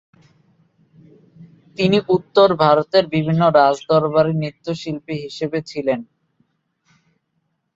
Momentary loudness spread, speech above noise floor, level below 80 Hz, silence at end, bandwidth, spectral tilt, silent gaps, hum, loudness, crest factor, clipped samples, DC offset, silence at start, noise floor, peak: 13 LU; 54 dB; -56 dBFS; 1.75 s; 7.8 kHz; -7 dB/octave; none; none; -18 LUFS; 20 dB; under 0.1%; under 0.1%; 1.4 s; -71 dBFS; 0 dBFS